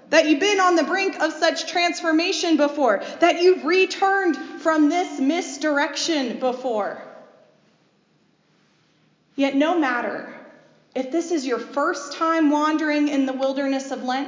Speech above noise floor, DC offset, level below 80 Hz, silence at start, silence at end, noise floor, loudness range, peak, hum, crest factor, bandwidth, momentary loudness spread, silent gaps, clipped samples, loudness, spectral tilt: 42 dB; under 0.1%; -84 dBFS; 0.1 s; 0 s; -62 dBFS; 8 LU; -4 dBFS; none; 18 dB; 7.6 kHz; 8 LU; none; under 0.1%; -21 LUFS; -2.5 dB/octave